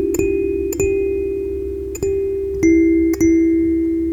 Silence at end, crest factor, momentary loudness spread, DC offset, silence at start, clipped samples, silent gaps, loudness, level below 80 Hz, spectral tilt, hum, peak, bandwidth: 0 s; 12 dB; 9 LU; 0.1%; 0 s; under 0.1%; none; -17 LUFS; -34 dBFS; -7 dB/octave; none; -4 dBFS; 15.5 kHz